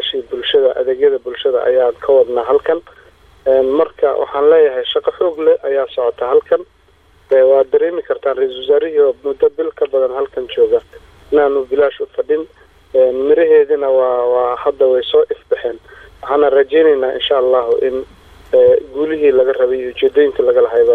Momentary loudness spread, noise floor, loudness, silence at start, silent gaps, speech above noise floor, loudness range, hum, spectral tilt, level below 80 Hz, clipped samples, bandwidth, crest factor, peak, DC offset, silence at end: 8 LU; -50 dBFS; -14 LUFS; 0 s; none; 37 dB; 2 LU; none; -6 dB/octave; -50 dBFS; under 0.1%; 4.1 kHz; 12 dB; -2 dBFS; under 0.1%; 0 s